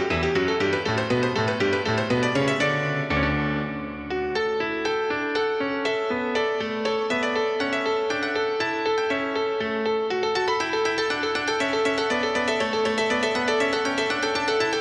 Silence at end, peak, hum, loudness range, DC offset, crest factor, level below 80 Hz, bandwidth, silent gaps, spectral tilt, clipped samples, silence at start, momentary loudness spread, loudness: 0 s; -10 dBFS; none; 2 LU; under 0.1%; 14 dB; -48 dBFS; 11 kHz; none; -4.5 dB/octave; under 0.1%; 0 s; 3 LU; -24 LUFS